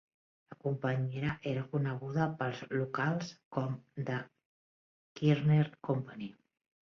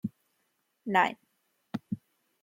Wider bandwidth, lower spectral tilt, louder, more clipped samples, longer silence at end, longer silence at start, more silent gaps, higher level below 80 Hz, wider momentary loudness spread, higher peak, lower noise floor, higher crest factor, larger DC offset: second, 6.8 kHz vs 16.5 kHz; first, -8 dB/octave vs -6 dB/octave; second, -34 LUFS vs -31 LUFS; neither; about the same, 0.55 s vs 0.45 s; first, 0.5 s vs 0.05 s; first, 3.45-3.51 s, 4.45-5.16 s vs none; first, -68 dBFS vs -80 dBFS; second, 11 LU vs 17 LU; second, -16 dBFS vs -12 dBFS; first, under -90 dBFS vs -77 dBFS; about the same, 20 dB vs 24 dB; neither